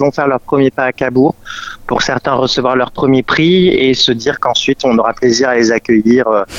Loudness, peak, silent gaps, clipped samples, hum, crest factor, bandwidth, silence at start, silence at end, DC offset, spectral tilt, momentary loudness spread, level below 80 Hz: -12 LUFS; 0 dBFS; none; under 0.1%; none; 12 dB; 7.8 kHz; 0 s; 0 s; under 0.1%; -4.5 dB/octave; 5 LU; -42 dBFS